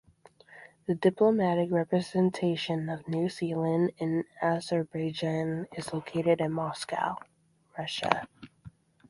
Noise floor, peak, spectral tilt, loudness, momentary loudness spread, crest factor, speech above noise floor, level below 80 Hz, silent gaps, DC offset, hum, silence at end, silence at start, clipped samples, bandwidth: -58 dBFS; -4 dBFS; -6.5 dB/octave; -30 LUFS; 9 LU; 26 dB; 29 dB; -68 dBFS; none; under 0.1%; none; 0.4 s; 0.5 s; under 0.1%; 11.5 kHz